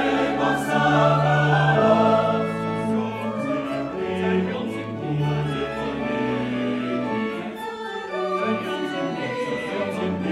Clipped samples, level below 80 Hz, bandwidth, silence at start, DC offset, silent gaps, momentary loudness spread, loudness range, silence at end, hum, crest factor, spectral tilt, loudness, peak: under 0.1%; -52 dBFS; 13 kHz; 0 s; under 0.1%; none; 10 LU; 6 LU; 0 s; none; 18 dB; -7 dB/octave; -23 LUFS; -4 dBFS